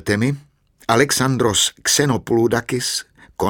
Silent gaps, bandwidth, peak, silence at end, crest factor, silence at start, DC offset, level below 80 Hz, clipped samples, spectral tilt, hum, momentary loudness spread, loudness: none; 18 kHz; 0 dBFS; 0 s; 18 dB; 0.05 s; under 0.1%; -48 dBFS; under 0.1%; -3.5 dB/octave; none; 10 LU; -18 LUFS